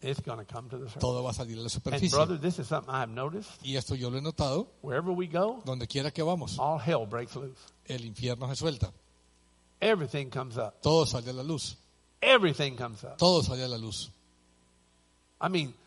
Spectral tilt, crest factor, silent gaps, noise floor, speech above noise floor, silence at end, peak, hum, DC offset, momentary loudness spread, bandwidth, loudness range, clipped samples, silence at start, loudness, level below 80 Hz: -5 dB/octave; 24 dB; none; -66 dBFS; 36 dB; 0.15 s; -8 dBFS; none; under 0.1%; 14 LU; 11.5 kHz; 6 LU; under 0.1%; 0 s; -31 LUFS; -54 dBFS